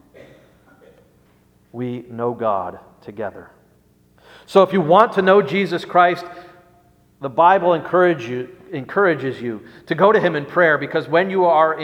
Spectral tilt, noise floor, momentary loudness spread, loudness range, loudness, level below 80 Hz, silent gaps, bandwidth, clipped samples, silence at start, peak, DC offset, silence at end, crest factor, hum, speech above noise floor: -7 dB/octave; -56 dBFS; 17 LU; 11 LU; -17 LUFS; -62 dBFS; none; 11 kHz; under 0.1%; 1.75 s; 0 dBFS; under 0.1%; 0 s; 18 dB; 60 Hz at -50 dBFS; 38 dB